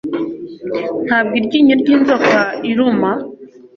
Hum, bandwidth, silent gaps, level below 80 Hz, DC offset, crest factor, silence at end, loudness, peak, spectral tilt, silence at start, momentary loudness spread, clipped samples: none; 6.8 kHz; none; -56 dBFS; under 0.1%; 14 dB; 0.3 s; -14 LUFS; -2 dBFS; -6 dB/octave; 0.05 s; 12 LU; under 0.1%